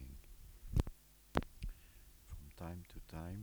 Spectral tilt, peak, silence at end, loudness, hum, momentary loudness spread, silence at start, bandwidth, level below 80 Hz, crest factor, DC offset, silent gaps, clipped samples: -6.5 dB/octave; -14 dBFS; 0 s; -46 LUFS; none; 20 LU; 0 s; over 20 kHz; -48 dBFS; 32 dB; under 0.1%; none; under 0.1%